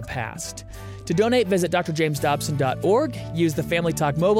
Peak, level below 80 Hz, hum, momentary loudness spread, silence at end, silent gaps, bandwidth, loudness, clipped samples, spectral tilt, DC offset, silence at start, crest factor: -8 dBFS; -46 dBFS; none; 13 LU; 0 s; none; 16.5 kHz; -23 LUFS; under 0.1%; -5.5 dB/octave; under 0.1%; 0 s; 14 dB